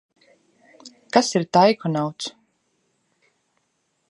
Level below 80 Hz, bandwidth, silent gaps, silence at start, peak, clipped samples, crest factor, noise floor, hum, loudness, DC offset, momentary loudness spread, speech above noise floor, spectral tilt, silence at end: -72 dBFS; 11.5 kHz; none; 0.85 s; -2 dBFS; under 0.1%; 22 dB; -71 dBFS; none; -20 LUFS; under 0.1%; 14 LU; 52 dB; -5 dB/octave; 1.8 s